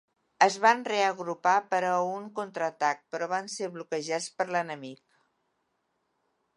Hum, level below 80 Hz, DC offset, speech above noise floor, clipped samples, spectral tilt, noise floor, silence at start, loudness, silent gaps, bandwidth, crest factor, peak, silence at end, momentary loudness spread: none; -86 dBFS; under 0.1%; 49 dB; under 0.1%; -3 dB/octave; -77 dBFS; 0.4 s; -28 LUFS; none; 11 kHz; 24 dB; -6 dBFS; 1.6 s; 12 LU